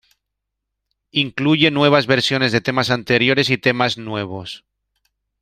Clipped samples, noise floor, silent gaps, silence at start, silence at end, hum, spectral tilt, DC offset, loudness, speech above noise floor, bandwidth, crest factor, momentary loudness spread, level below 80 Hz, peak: under 0.1%; -79 dBFS; none; 1.15 s; 0.85 s; none; -5 dB/octave; under 0.1%; -17 LUFS; 62 dB; 14 kHz; 20 dB; 13 LU; -56 dBFS; 0 dBFS